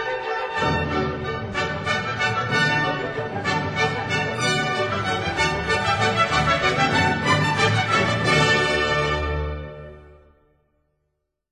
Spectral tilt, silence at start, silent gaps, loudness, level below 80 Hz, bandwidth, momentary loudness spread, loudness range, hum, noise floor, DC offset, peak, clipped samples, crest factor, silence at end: -4.5 dB/octave; 0 s; none; -21 LUFS; -40 dBFS; 16 kHz; 8 LU; 4 LU; none; -76 dBFS; under 0.1%; -6 dBFS; under 0.1%; 16 dB; 1.4 s